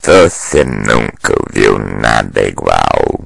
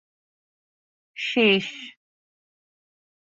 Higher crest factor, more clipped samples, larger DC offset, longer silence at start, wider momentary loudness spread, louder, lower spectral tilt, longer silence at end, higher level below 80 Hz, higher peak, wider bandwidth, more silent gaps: second, 10 dB vs 22 dB; first, 0.7% vs under 0.1%; neither; second, 0.05 s vs 1.15 s; second, 5 LU vs 23 LU; first, -11 LUFS vs -21 LUFS; about the same, -4.5 dB/octave vs -4.5 dB/octave; second, 0 s vs 1.35 s; first, -30 dBFS vs -72 dBFS; first, 0 dBFS vs -6 dBFS; first, 12 kHz vs 7.8 kHz; neither